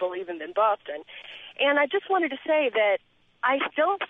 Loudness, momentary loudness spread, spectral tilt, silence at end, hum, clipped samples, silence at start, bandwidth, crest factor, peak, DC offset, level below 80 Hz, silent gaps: -25 LUFS; 16 LU; -5.5 dB/octave; 0.05 s; none; under 0.1%; 0 s; 3.9 kHz; 16 dB; -10 dBFS; under 0.1%; -78 dBFS; none